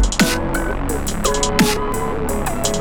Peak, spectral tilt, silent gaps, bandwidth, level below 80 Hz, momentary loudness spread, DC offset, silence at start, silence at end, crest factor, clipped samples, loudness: -2 dBFS; -4 dB/octave; none; over 20 kHz; -24 dBFS; 6 LU; under 0.1%; 0 s; 0 s; 16 dB; under 0.1%; -19 LUFS